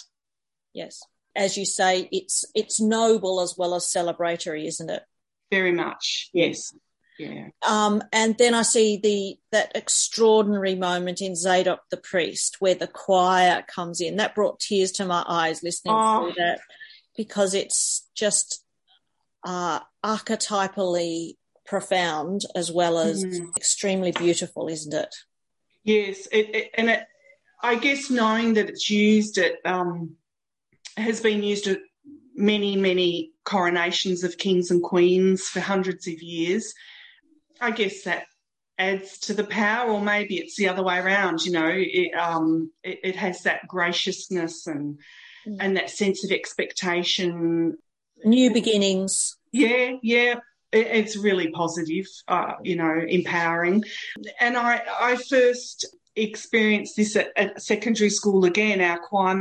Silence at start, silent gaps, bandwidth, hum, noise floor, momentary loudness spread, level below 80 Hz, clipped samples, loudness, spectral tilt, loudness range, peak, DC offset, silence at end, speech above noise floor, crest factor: 0.75 s; none; 11.5 kHz; none; -90 dBFS; 11 LU; -72 dBFS; under 0.1%; -23 LUFS; -3.5 dB/octave; 5 LU; -6 dBFS; under 0.1%; 0 s; 66 dB; 18 dB